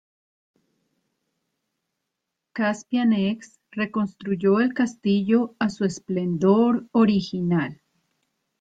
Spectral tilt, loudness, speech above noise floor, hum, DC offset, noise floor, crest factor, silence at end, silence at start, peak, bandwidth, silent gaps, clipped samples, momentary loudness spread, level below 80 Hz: -7 dB/octave; -23 LUFS; 60 dB; none; under 0.1%; -82 dBFS; 18 dB; 0.85 s; 2.55 s; -6 dBFS; 7.8 kHz; none; under 0.1%; 8 LU; -64 dBFS